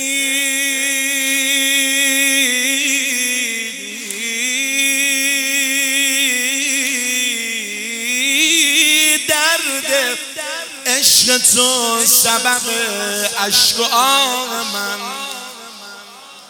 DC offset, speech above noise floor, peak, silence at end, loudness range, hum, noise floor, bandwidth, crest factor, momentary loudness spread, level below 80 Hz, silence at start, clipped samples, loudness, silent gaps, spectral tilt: under 0.1%; 22 dB; 0 dBFS; 0 s; 3 LU; none; -38 dBFS; over 20 kHz; 16 dB; 12 LU; -64 dBFS; 0 s; under 0.1%; -14 LUFS; none; 1 dB/octave